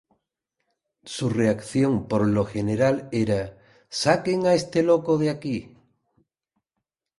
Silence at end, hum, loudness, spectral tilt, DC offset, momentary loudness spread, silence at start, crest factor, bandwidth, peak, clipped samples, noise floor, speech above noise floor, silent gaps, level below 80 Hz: 1.5 s; none; -23 LUFS; -6 dB/octave; under 0.1%; 9 LU; 1.05 s; 20 dB; 11.5 kHz; -4 dBFS; under 0.1%; -83 dBFS; 61 dB; none; -54 dBFS